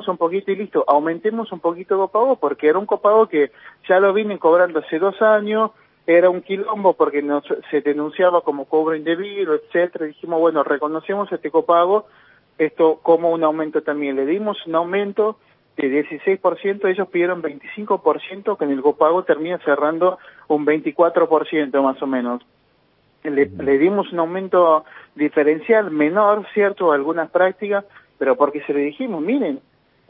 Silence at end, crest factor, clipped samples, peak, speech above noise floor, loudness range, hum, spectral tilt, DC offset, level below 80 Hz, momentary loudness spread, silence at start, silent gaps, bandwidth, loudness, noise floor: 0.5 s; 18 dB; under 0.1%; -2 dBFS; 42 dB; 4 LU; none; -10.5 dB/octave; under 0.1%; -66 dBFS; 8 LU; 0 s; none; 4.6 kHz; -19 LUFS; -60 dBFS